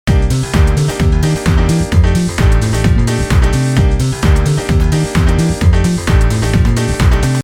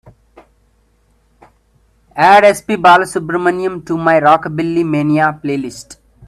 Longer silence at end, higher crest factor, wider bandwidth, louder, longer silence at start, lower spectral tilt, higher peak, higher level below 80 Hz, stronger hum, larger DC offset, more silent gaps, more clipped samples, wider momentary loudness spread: second, 0 s vs 0.35 s; about the same, 10 dB vs 14 dB; first, 16 kHz vs 14 kHz; about the same, -13 LUFS vs -12 LUFS; second, 0.05 s vs 2.15 s; about the same, -6 dB/octave vs -5.5 dB/octave; about the same, 0 dBFS vs 0 dBFS; first, -14 dBFS vs -52 dBFS; neither; neither; neither; neither; second, 1 LU vs 12 LU